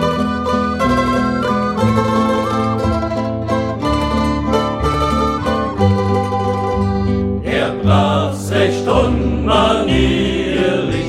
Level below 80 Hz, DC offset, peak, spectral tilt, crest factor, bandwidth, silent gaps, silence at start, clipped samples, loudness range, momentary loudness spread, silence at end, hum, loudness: -28 dBFS; under 0.1%; -2 dBFS; -6.5 dB/octave; 14 dB; 13 kHz; none; 0 s; under 0.1%; 2 LU; 4 LU; 0 s; none; -16 LUFS